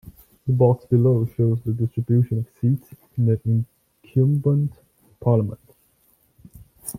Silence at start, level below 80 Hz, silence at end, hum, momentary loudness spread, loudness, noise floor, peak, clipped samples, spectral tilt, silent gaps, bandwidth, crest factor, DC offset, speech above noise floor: 0.05 s; -54 dBFS; 0 s; none; 12 LU; -22 LUFS; -62 dBFS; -4 dBFS; under 0.1%; -10 dB/octave; none; 15.5 kHz; 18 dB; under 0.1%; 42 dB